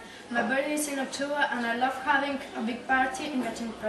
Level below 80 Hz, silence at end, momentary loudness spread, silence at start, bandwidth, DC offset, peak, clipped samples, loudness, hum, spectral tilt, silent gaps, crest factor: -64 dBFS; 0 s; 7 LU; 0 s; 13 kHz; under 0.1%; -12 dBFS; under 0.1%; -28 LUFS; none; -3 dB/octave; none; 16 dB